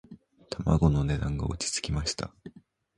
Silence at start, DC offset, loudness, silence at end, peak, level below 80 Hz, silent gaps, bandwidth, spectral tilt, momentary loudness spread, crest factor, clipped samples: 0.1 s; under 0.1%; -28 LUFS; 0.45 s; -8 dBFS; -38 dBFS; none; 11.5 kHz; -5 dB/octave; 12 LU; 22 dB; under 0.1%